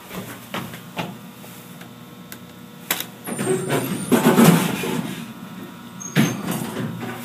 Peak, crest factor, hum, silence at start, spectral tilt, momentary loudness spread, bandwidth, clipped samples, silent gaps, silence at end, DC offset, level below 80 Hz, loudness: 0 dBFS; 22 dB; none; 0 s; -5 dB/octave; 23 LU; 15.5 kHz; under 0.1%; none; 0 s; under 0.1%; -62 dBFS; -21 LUFS